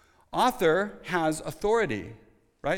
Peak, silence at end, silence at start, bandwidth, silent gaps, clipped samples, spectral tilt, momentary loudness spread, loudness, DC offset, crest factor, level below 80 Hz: -10 dBFS; 0 s; 0.35 s; 19 kHz; none; under 0.1%; -4.5 dB/octave; 12 LU; -27 LUFS; under 0.1%; 16 dB; -52 dBFS